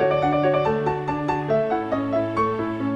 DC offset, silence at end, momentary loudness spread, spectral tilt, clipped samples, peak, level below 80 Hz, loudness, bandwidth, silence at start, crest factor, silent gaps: under 0.1%; 0 s; 5 LU; -8 dB/octave; under 0.1%; -10 dBFS; -48 dBFS; -23 LUFS; 8.8 kHz; 0 s; 12 dB; none